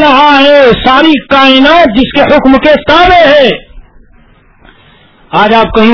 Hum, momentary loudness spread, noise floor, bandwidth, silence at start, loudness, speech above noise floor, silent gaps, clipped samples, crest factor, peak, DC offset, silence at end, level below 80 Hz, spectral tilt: none; 5 LU; -41 dBFS; 5.4 kHz; 0 s; -4 LUFS; 36 dB; none; 10%; 6 dB; 0 dBFS; under 0.1%; 0 s; -28 dBFS; -5.5 dB/octave